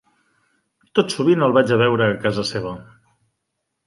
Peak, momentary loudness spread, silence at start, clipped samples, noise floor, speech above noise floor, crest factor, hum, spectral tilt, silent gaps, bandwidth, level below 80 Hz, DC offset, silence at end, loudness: -2 dBFS; 12 LU; 0.95 s; under 0.1%; -77 dBFS; 59 dB; 18 dB; none; -6 dB/octave; none; 11.5 kHz; -56 dBFS; under 0.1%; 1.05 s; -18 LUFS